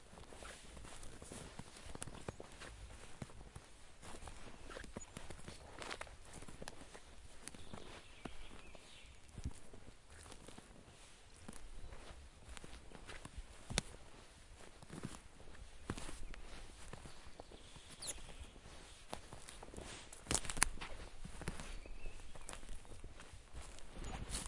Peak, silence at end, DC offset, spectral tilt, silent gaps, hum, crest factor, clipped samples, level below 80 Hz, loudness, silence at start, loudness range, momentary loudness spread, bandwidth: -10 dBFS; 0 s; under 0.1%; -2.5 dB/octave; none; none; 38 dB; under 0.1%; -56 dBFS; -50 LUFS; 0 s; 13 LU; 12 LU; 11.5 kHz